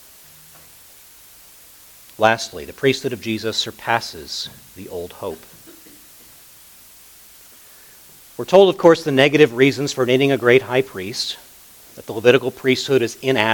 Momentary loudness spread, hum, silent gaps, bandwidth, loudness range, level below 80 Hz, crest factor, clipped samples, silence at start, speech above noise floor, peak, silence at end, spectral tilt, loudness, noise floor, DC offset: 18 LU; none; none; 19 kHz; 18 LU; -58 dBFS; 20 dB; under 0.1%; 2.2 s; 28 dB; 0 dBFS; 0 s; -4.5 dB/octave; -17 LUFS; -45 dBFS; under 0.1%